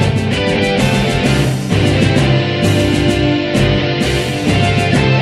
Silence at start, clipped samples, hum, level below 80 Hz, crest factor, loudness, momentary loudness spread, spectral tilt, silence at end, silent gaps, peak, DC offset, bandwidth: 0 s; under 0.1%; none; -28 dBFS; 12 dB; -13 LUFS; 3 LU; -6 dB/octave; 0 s; none; 0 dBFS; under 0.1%; 13.5 kHz